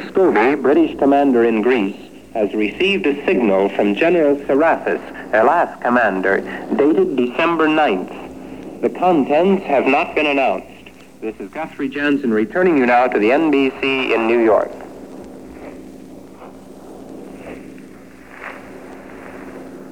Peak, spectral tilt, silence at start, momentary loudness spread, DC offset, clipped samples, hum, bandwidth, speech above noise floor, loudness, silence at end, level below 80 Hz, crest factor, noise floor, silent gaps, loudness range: -2 dBFS; -6.5 dB/octave; 0 s; 21 LU; 0.4%; under 0.1%; none; 12.5 kHz; 25 dB; -16 LUFS; 0 s; -54 dBFS; 16 dB; -41 dBFS; none; 19 LU